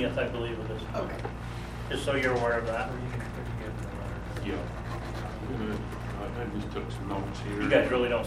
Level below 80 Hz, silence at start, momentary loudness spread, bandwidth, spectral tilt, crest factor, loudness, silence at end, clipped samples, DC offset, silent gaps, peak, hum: -42 dBFS; 0 s; 10 LU; 14.5 kHz; -6.5 dB/octave; 20 dB; -32 LUFS; 0 s; under 0.1%; under 0.1%; none; -10 dBFS; none